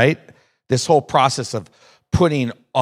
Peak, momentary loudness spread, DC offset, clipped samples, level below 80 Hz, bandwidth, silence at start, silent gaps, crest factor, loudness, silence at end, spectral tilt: 0 dBFS; 11 LU; under 0.1%; under 0.1%; -44 dBFS; 13.5 kHz; 0 s; none; 18 dB; -19 LUFS; 0 s; -5 dB/octave